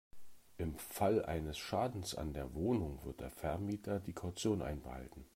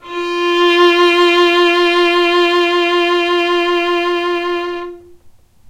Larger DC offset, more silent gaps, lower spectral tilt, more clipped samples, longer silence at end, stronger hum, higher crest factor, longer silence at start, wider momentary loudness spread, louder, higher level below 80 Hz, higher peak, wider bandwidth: neither; neither; first, -6 dB/octave vs -2 dB/octave; neither; second, 0.1 s vs 0.4 s; neither; first, 18 dB vs 12 dB; about the same, 0.15 s vs 0.05 s; about the same, 10 LU vs 10 LU; second, -40 LUFS vs -12 LUFS; about the same, -54 dBFS vs -52 dBFS; second, -22 dBFS vs -2 dBFS; first, 16 kHz vs 10.5 kHz